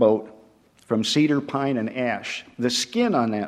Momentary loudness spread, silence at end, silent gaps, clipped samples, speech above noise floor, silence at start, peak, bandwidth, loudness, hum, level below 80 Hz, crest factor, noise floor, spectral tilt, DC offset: 7 LU; 0 s; none; under 0.1%; 33 dB; 0 s; -4 dBFS; 15 kHz; -23 LUFS; none; -66 dBFS; 18 dB; -55 dBFS; -4.5 dB/octave; under 0.1%